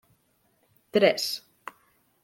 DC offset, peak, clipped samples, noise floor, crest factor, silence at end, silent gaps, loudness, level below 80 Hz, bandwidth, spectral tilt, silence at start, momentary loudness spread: under 0.1%; -6 dBFS; under 0.1%; -69 dBFS; 24 dB; 0.85 s; none; -25 LUFS; -76 dBFS; 16.5 kHz; -3.5 dB/octave; 0.95 s; 24 LU